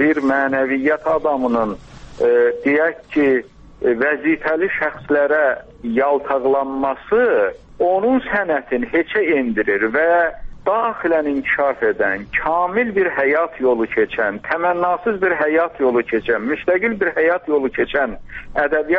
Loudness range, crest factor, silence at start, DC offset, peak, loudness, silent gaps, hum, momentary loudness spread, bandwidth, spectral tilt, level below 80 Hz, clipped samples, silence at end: 1 LU; 16 dB; 0 s; under 0.1%; -2 dBFS; -18 LUFS; none; none; 5 LU; 6.6 kHz; -7 dB/octave; -44 dBFS; under 0.1%; 0 s